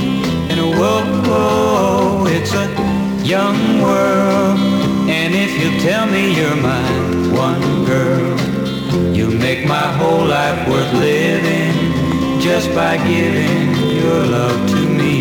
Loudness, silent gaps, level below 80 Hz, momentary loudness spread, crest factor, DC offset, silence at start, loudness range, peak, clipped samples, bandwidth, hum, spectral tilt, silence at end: -15 LUFS; none; -42 dBFS; 3 LU; 12 dB; under 0.1%; 0 s; 1 LU; -4 dBFS; under 0.1%; 19.5 kHz; none; -6 dB/octave; 0 s